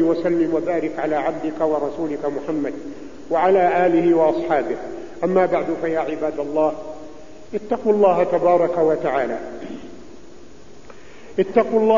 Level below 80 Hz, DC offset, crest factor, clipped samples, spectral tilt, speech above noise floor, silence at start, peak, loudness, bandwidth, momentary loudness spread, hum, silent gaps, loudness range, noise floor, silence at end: -54 dBFS; 1%; 18 dB; under 0.1%; -7.5 dB/octave; 25 dB; 0 s; -2 dBFS; -20 LUFS; 7.4 kHz; 17 LU; none; none; 4 LU; -44 dBFS; 0 s